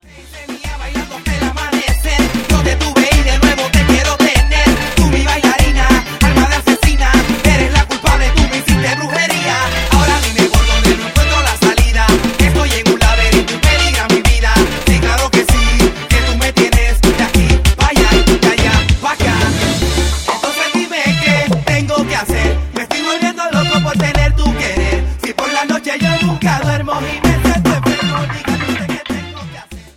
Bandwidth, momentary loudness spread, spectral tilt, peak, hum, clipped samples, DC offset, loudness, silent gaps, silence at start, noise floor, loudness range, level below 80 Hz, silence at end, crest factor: 17 kHz; 7 LU; -4.5 dB/octave; 0 dBFS; none; under 0.1%; under 0.1%; -13 LUFS; none; 0.15 s; -32 dBFS; 3 LU; -16 dBFS; 0.1 s; 12 dB